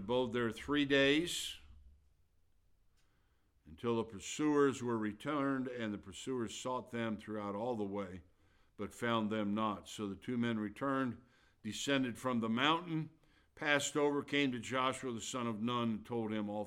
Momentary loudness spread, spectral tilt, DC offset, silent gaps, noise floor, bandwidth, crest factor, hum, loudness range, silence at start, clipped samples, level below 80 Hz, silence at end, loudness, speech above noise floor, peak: 11 LU; -4.5 dB/octave; under 0.1%; none; -74 dBFS; 16 kHz; 22 dB; none; 5 LU; 0 s; under 0.1%; -68 dBFS; 0 s; -37 LUFS; 37 dB; -16 dBFS